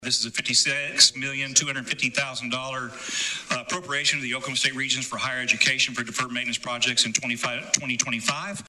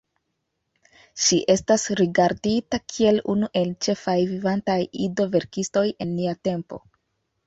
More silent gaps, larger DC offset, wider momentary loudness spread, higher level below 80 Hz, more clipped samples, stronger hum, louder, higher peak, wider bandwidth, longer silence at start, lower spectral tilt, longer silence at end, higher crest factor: neither; neither; about the same, 9 LU vs 8 LU; second, -66 dBFS vs -56 dBFS; neither; neither; about the same, -23 LUFS vs -23 LUFS; about the same, -2 dBFS vs -4 dBFS; first, 14 kHz vs 8 kHz; second, 0 s vs 1.15 s; second, -0.5 dB/octave vs -4.5 dB/octave; second, 0 s vs 0.7 s; first, 24 dB vs 18 dB